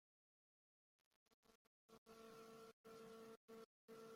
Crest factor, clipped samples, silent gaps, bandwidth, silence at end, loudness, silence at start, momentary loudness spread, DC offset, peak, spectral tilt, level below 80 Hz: 14 dB; under 0.1%; 1.34-1.43 s, 1.55-1.89 s, 1.98-2.06 s, 2.73-2.84 s, 3.37-3.48 s, 3.65-3.88 s; 16 kHz; 0 s; -63 LUFS; 1.3 s; 3 LU; under 0.1%; -52 dBFS; -4 dB/octave; under -90 dBFS